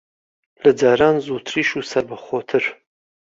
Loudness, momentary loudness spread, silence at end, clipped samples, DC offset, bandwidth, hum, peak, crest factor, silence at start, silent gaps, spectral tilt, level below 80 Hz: -19 LUFS; 10 LU; 0.6 s; under 0.1%; under 0.1%; 7.8 kHz; none; -2 dBFS; 18 dB; 0.65 s; none; -5 dB/octave; -58 dBFS